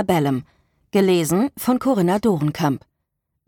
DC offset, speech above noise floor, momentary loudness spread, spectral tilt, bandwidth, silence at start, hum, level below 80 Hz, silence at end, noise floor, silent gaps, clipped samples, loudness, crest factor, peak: under 0.1%; 57 dB; 6 LU; -6 dB/octave; 19 kHz; 0 s; none; -54 dBFS; 0.7 s; -76 dBFS; none; under 0.1%; -20 LUFS; 14 dB; -6 dBFS